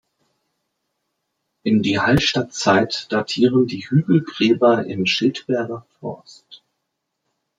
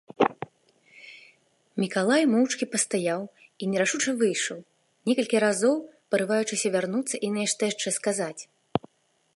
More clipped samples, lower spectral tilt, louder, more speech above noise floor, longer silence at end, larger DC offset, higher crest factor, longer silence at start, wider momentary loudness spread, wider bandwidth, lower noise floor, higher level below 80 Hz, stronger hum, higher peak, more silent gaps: neither; first, -5.5 dB/octave vs -3.5 dB/octave; first, -18 LUFS vs -26 LUFS; first, 58 dB vs 42 dB; first, 1 s vs 0.55 s; neither; about the same, 18 dB vs 22 dB; first, 1.65 s vs 0.2 s; about the same, 14 LU vs 15 LU; about the same, 12.5 kHz vs 11.5 kHz; first, -77 dBFS vs -68 dBFS; first, -50 dBFS vs -70 dBFS; neither; first, -2 dBFS vs -6 dBFS; neither